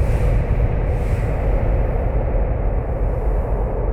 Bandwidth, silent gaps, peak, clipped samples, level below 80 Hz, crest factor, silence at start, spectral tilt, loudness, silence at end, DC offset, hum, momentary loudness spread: 3.3 kHz; none; -6 dBFS; under 0.1%; -20 dBFS; 12 dB; 0 s; -9.5 dB/octave; -21 LUFS; 0 s; under 0.1%; none; 3 LU